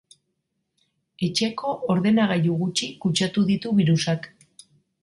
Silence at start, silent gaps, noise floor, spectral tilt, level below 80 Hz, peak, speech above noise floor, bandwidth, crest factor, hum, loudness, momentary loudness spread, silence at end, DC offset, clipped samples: 1.2 s; none; -77 dBFS; -5.5 dB/octave; -62 dBFS; -8 dBFS; 55 dB; 11.5 kHz; 16 dB; none; -23 LUFS; 8 LU; 0.75 s; under 0.1%; under 0.1%